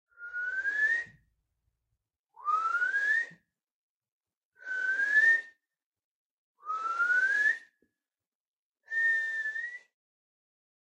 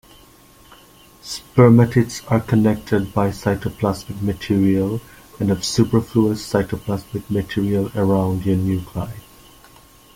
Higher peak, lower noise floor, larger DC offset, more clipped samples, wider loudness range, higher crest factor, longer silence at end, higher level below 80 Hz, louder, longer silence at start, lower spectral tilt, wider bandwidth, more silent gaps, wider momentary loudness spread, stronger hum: second, -16 dBFS vs -2 dBFS; first, under -90 dBFS vs -48 dBFS; neither; neither; about the same, 5 LU vs 4 LU; about the same, 18 dB vs 18 dB; first, 1.2 s vs 0.95 s; second, -82 dBFS vs -46 dBFS; second, -28 LUFS vs -19 LUFS; second, 0.2 s vs 1.25 s; second, 0 dB/octave vs -7 dB/octave; second, 10.5 kHz vs 16.5 kHz; first, 2.19-2.24 s, 3.71-4.00 s, 4.12-4.21 s, 4.37-4.50 s, 5.86-5.92 s, 6.04-6.55 s, 8.27-8.75 s vs none; first, 16 LU vs 12 LU; neither